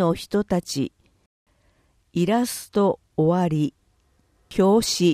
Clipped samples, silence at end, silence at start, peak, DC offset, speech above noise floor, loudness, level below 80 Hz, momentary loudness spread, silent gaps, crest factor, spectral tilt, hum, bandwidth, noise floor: under 0.1%; 0 s; 0 s; -6 dBFS; under 0.1%; 42 dB; -23 LUFS; -52 dBFS; 10 LU; 1.26-1.46 s; 16 dB; -5.5 dB/octave; none; 15.5 kHz; -63 dBFS